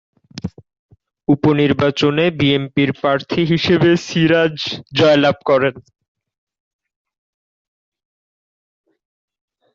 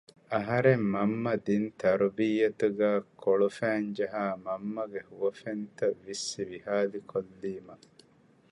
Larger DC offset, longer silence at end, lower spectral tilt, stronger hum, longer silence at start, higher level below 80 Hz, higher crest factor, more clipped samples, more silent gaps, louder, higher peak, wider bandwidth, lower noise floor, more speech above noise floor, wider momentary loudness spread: neither; first, 3.95 s vs 0.75 s; about the same, -6.5 dB/octave vs -6 dB/octave; neither; about the same, 0.35 s vs 0.3 s; first, -50 dBFS vs -68 dBFS; about the same, 16 dB vs 20 dB; neither; first, 0.79-0.89 s vs none; first, -16 LUFS vs -30 LUFS; first, -2 dBFS vs -10 dBFS; second, 7.6 kHz vs 11 kHz; first, under -90 dBFS vs -62 dBFS; first, over 75 dB vs 33 dB; about the same, 10 LU vs 11 LU